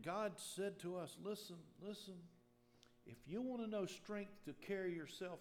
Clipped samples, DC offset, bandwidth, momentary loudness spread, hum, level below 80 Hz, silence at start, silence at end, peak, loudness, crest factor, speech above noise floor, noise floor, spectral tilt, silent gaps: under 0.1%; under 0.1%; 18.5 kHz; 14 LU; none; -82 dBFS; 0 s; 0 s; -34 dBFS; -48 LUFS; 16 dB; 24 dB; -72 dBFS; -5 dB/octave; none